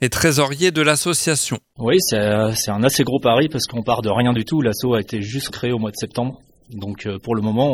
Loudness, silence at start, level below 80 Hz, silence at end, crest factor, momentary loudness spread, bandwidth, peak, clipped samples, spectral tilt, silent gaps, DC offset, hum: -19 LUFS; 0 s; -48 dBFS; 0 s; 18 dB; 9 LU; 17 kHz; 0 dBFS; under 0.1%; -4.5 dB/octave; none; under 0.1%; none